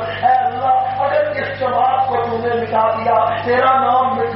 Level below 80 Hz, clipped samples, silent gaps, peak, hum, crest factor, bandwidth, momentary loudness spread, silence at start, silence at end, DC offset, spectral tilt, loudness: -50 dBFS; under 0.1%; none; -4 dBFS; 50 Hz at -35 dBFS; 12 dB; 5.8 kHz; 5 LU; 0 s; 0 s; under 0.1%; -3 dB/octave; -16 LUFS